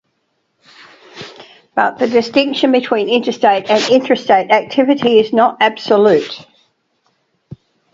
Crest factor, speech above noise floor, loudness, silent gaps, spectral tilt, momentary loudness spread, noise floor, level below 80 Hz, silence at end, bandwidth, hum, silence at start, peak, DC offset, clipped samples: 14 dB; 53 dB; -13 LUFS; none; -4.5 dB/octave; 15 LU; -66 dBFS; -60 dBFS; 1.5 s; 7.8 kHz; none; 1.15 s; 0 dBFS; under 0.1%; under 0.1%